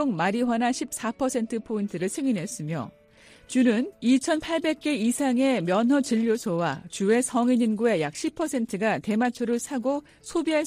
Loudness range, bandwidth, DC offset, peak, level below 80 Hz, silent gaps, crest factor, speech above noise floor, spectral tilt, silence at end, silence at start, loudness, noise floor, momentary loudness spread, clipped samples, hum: 4 LU; 15 kHz; under 0.1%; -10 dBFS; -62 dBFS; none; 16 dB; 29 dB; -5 dB/octave; 0 s; 0 s; -25 LUFS; -54 dBFS; 7 LU; under 0.1%; none